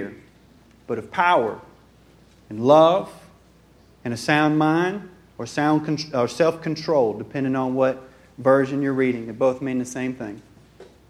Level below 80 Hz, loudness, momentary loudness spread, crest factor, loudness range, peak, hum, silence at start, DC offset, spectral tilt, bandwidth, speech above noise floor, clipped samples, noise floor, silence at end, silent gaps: -60 dBFS; -21 LUFS; 17 LU; 20 dB; 2 LU; -2 dBFS; none; 0 s; under 0.1%; -6 dB/octave; 13.5 kHz; 32 dB; under 0.1%; -53 dBFS; 0.25 s; none